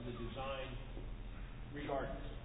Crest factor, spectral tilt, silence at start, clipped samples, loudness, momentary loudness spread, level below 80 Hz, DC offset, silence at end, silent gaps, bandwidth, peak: 16 dB; -4 dB/octave; 0 s; under 0.1%; -46 LUFS; 9 LU; -48 dBFS; under 0.1%; 0 s; none; 3.9 kHz; -28 dBFS